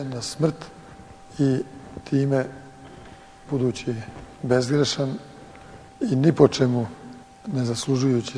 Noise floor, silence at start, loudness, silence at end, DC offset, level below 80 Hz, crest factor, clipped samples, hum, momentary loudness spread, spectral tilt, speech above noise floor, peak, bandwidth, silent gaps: -45 dBFS; 0 s; -23 LUFS; 0 s; under 0.1%; -54 dBFS; 22 dB; under 0.1%; none; 24 LU; -6 dB/octave; 22 dB; -2 dBFS; 11 kHz; none